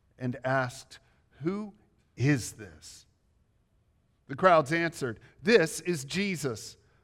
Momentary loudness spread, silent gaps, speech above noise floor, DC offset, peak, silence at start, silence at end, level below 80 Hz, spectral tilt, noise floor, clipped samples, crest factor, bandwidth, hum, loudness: 22 LU; none; 40 dB; under 0.1%; -8 dBFS; 0.2 s; 0.3 s; -66 dBFS; -5 dB/octave; -69 dBFS; under 0.1%; 24 dB; 16.5 kHz; none; -28 LUFS